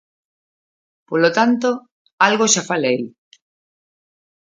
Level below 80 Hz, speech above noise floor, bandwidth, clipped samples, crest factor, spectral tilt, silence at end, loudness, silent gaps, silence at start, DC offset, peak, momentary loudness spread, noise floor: -72 dBFS; over 73 dB; 9.6 kHz; under 0.1%; 20 dB; -3 dB/octave; 1.5 s; -17 LUFS; 1.91-2.05 s, 2.13-2.18 s; 1.1 s; under 0.1%; 0 dBFS; 9 LU; under -90 dBFS